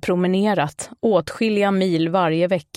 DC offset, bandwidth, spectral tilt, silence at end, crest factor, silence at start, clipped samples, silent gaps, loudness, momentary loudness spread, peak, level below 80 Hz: under 0.1%; 13 kHz; -6 dB/octave; 0.15 s; 14 dB; 0.05 s; under 0.1%; none; -20 LUFS; 4 LU; -6 dBFS; -58 dBFS